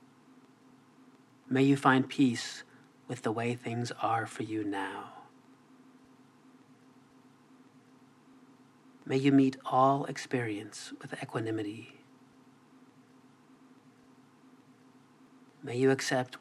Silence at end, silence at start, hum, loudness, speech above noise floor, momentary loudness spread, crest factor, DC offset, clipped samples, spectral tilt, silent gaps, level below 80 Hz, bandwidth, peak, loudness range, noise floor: 0.05 s; 1.5 s; none; -31 LUFS; 30 dB; 18 LU; 26 dB; under 0.1%; under 0.1%; -6 dB/octave; none; -88 dBFS; 12.5 kHz; -8 dBFS; 12 LU; -60 dBFS